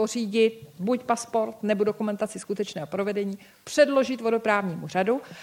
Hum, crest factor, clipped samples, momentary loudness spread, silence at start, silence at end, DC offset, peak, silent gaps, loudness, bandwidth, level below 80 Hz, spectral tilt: none; 18 dB; under 0.1%; 9 LU; 0 s; 0 s; under 0.1%; -8 dBFS; none; -26 LUFS; 16.5 kHz; -72 dBFS; -5 dB/octave